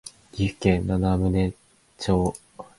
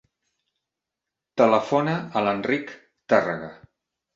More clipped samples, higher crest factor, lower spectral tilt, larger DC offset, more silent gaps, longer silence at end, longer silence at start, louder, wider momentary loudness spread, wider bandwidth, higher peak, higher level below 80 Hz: neither; about the same, 20 dB vs 22 dB; about the same, -7 dB/octave vs -6.5 dB/octave; neither; neither; second, 0.15 s vs 0.6 s; second, 0.05 s vs 1.35 s; about the same, -24 LUFS vs -23 LUFS; second, 10 LU vs 14 LU; first, 11.5 kHz vs 7.6 kHz; about the same, -4 dBFS vs -4 dBFS; first, -38 dBFS vs -66 dBFS